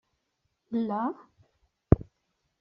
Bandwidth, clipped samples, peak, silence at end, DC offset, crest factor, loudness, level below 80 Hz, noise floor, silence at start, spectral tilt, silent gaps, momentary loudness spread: 5.4 kHz; under 0.1%; -2 dBFS; 0.6 s; under 0.1%; 30 dB; -29 LUFS; -42 dBFS; -78 dBFS; 0.7 s; -10 dB/octave; none; 8 LU